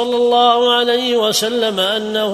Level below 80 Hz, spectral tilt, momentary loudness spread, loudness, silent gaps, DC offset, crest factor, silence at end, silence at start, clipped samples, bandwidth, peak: -56 dBFS; -2.5 dB/octave; 5 LU; -14 LUFS; none; under 0.1%; 14 dB; 0 s; 0 s; under 0.1%; 14 kHz; 0 dBFS